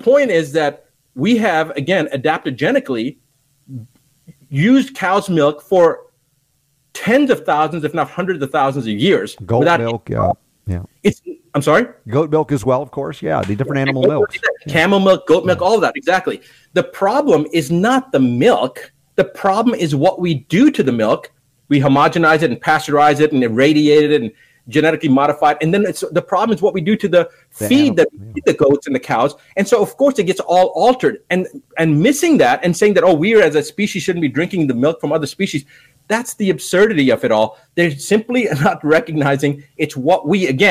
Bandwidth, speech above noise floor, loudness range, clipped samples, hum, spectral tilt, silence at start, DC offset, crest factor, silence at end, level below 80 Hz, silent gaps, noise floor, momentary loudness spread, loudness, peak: 15.5 kHz; 48 dB; 4 LU; under 0.1%; none; -6 dB/octave; 0.05 s; under 0.1%; 14 dB; 0 s; -52 dBFS; none; -62 dBFS; 8 LU; -15 LUFS; -2 dBFS